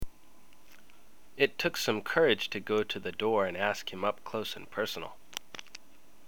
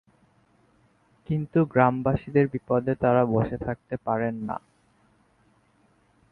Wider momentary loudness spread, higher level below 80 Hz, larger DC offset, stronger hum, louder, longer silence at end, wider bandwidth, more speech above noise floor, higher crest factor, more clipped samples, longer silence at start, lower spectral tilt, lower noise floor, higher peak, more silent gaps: first, 19 LU vs 11 LU; second, -58 dBFS vs -52 dBFS; first, 0.5% vs under 0.1%; neither; second, -31 LUFS vs -25 LUFS; second, 0.95 s vs 1.75 s; first, over 20 kHz vs 4.4 kHz; second, 31 dB vs 40 dB; about the same, 24 dB vs 22 dB; neither; second, 0 s vs 1.3 s; second, -3.5 dB/octave vs -11 dB/octave; about the same, -62 dBFS vs -64 dBFS; second, -10 dBFS vs -4 dBFS; neither